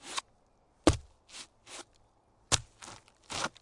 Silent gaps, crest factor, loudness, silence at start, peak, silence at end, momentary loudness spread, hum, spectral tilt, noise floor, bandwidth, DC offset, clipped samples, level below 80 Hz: none; 36 dB; -32 LUFS; 0.05 s; -2 dBFS; 0.15 s; 20 LU; none; -3.5 dB/octave; -67 dBFS; 11.5 kHz; under 0.1%; under 0.1%; -48 dBFS